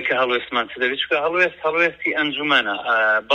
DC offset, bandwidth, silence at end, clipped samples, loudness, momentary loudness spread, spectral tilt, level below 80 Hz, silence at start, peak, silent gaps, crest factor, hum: under 0.1%; 9.2 kHz; 0 s; under 0.1%; -19 LUFS; 4 LU; -4 dB/octave; -60 dBFS; 0 s; -2 dBFS; none; 18 dB; none